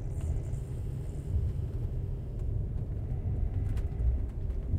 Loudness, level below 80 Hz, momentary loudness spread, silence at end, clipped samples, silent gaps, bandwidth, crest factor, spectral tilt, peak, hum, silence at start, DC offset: -35 LUFS; -34 dBFS; 5 LU; 0 s; under 0.1%; none; 9.6 kHz; 14 dB; -9 dB/octave; -18 dBFS; none; 0 s; under 0.1%